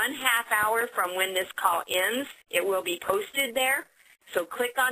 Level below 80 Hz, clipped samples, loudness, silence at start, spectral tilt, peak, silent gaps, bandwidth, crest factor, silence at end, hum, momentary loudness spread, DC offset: -70 dBFS; under 0.1%; -26 LUFS; 0 s; -0.5 dB/octave; -6 dBFS; none; 15.5 kHz; 22 dB; 0 s; none; 6 LU; under 0.1%